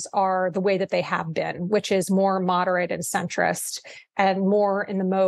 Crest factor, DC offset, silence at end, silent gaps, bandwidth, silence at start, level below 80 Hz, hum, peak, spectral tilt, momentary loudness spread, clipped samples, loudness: 16 dB; under 0.1%; 0 s; none; 12.5 kHz; 0 s; -70 dBFS; none; -8 dBFS; -5 dB/octave; 7 LU; under 0.1%; -23 LUFS